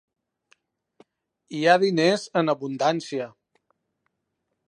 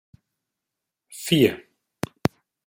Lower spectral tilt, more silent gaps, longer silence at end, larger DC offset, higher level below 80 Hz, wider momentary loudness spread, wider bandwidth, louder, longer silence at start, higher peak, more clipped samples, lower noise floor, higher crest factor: about the same, -5 dB/octave vs -5 dB/octave; neither; first, 1.4 s vs 1.05 s; neither; second, -80 dBFS vs -58 dBFS; second, 14 LU vs 19 LU; second, 11.5 kHz vs 16 kHz; about the same, -23 LUFS vs -23 LUFS; first, 1.5 s vs 1.1 s; about the same, -4 dBFS vs -2 dBFS; neither; second, -79 dBFS vs -85 dBFS; about the same, 24 dB vs 24 dB